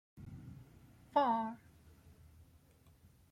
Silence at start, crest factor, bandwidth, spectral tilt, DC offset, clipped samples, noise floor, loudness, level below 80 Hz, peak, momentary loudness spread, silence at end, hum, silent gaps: 0.15 s; 24 dB; 16 kHz; -7 dB/octave; under 0.1%; under 0.1%; -65 dBFS; -36 LUFS; -68 dBFS; -18 dBFS; 24 LU; 1.75 s; none; none